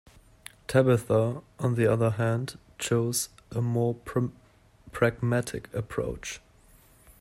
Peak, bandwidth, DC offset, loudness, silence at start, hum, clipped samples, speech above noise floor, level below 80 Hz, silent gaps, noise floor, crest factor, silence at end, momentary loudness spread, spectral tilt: -8 dBFS; 15.5 kHz; under 0.1%; -28 LUFS; 0.7 s; none; under 0.1%; 31 dB; -54 dBFS; none; -57 dBFS; 20 dB; 0.85 s; 15 LU; -6 dB/octave